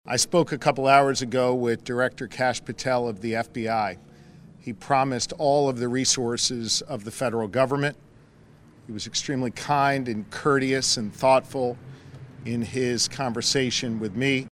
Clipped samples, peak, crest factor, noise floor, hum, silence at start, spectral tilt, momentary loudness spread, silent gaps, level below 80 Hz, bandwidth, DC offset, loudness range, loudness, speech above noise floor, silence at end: under 0.1%; -4 dBFS; 22 dB; -52 dBFS; none; 0.05 s; -3.5 dB/octave; 10 LU; none; -58 dBFS; 15.5 kHz; under 0.1%; 3 LU; -24 LUFS; 28 dB; 0.05 s